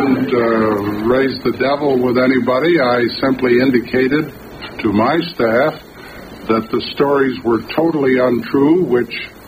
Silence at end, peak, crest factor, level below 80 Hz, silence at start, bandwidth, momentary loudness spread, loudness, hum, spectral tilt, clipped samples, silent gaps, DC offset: 0 s; 0 dBFS; 14 dB; -46 dBFS; 0 s; 15 kHz; 8 LU; -15 LUFS; none; -7.5 dB/octave; under 0.1%; none; under 0.1%